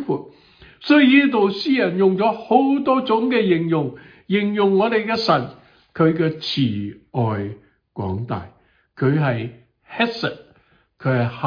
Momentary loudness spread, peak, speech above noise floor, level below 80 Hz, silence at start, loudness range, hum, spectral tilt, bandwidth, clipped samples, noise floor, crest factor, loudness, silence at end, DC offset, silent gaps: 13 LU; -2 dBFS; 39 dB; -58 dBFS; 0 s; 8 LU; none; -8 dB/octave; 5.2 kHz; under 0.1%; -57 dBFS; 18 dB; -19 LUFS; 0 s; under 0.1%; none